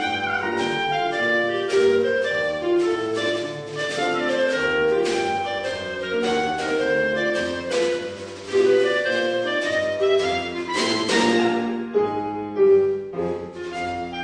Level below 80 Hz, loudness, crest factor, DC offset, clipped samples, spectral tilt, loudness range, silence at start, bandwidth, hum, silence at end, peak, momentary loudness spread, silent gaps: -56 dBFS; -22 LUFS; 16 dB; under 0.1%; under 0.1%; -4 dB/octave; 2 LU; 0 s; 10.5 kHz; none; 0 s; -6 dBFS; 9 LU; none